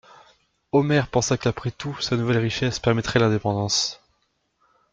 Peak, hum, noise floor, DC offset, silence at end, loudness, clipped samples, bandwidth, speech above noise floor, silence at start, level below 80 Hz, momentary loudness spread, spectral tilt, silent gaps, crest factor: -4 dBFS; none; -70 dBFS; under 0.1%; 0.95 s; -23 LUFS; under 0.1%; 9.2 kHz; 48 dB; 0.75 s; -50 dBFS; 7 LU; -4.5 dB/octave; none; 20 dB